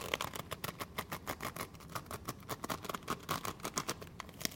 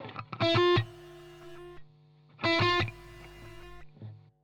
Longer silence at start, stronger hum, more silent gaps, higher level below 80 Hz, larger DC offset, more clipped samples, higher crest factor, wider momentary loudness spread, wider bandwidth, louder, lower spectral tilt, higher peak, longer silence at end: about the same, 0 s vs 0 s; neither; neither; second, -62 dBFS vs -56 dBFS; neither; neither; first, 32 dB vs 18 dB; second, 6 LU vs 24 LU; first, 17 kHz vs 9.8 kHz; second, -42 LUFS vs -27 LUFS; second, -3 dB/octave vs -6 dB/octave; about the same, -12 dBFS vs -14 dBFS; second, 0 s vs 0.25 s